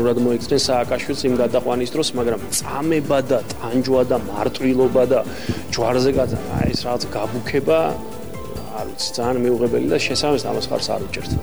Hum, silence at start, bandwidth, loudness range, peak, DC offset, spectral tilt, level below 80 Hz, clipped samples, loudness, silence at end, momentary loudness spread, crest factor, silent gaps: none; 0 s; over 20 kHz; 2 LU; -6 dBFS; 2%; -5 dB/octave; -42 dBFS; under 0.1%; -20 LUFS; 0 s; 7 LU; 14 dB; none